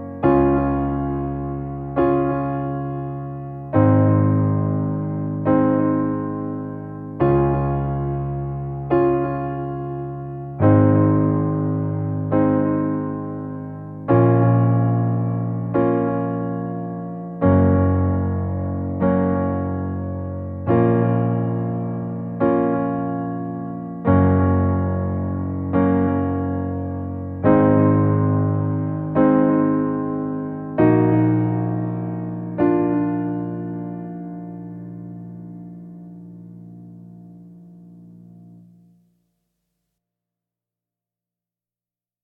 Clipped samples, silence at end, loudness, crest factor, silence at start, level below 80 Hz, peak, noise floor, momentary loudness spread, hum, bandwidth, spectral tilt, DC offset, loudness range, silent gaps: under 0.1%; 3.65 s; -20 LUFS; 18 dB; 0 s; -42 dBFS; -4 dBFS; under -90 dBFS; 15 LU; none; 3.6 kHz; -13 dB/octave; under 0.1%; 5 LU; none